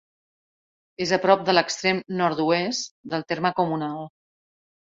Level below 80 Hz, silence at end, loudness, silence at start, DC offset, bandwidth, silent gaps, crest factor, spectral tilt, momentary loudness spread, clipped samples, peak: -66 dBFS; 0.8 s; -23 LUFS; 1 s; under 0.1%; 8 kHz; 2.91-3.04 s; 22 dB; -4 dB/octave; 11 LU; under 0.1%; -4 dBFS